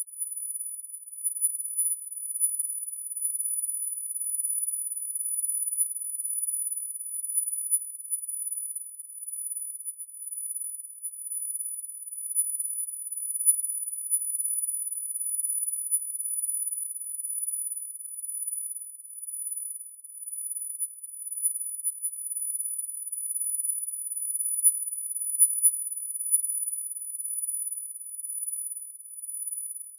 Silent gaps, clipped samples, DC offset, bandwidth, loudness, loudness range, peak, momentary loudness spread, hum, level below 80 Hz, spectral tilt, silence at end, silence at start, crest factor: none; under 0.1%; under 0.1%; 11 kHz; -26 LUFS; 8 LU; -8 dBFS; 11 LU; none; under -90 dBFS; 7 dB/octave; 0 s; 0 s; 20 dB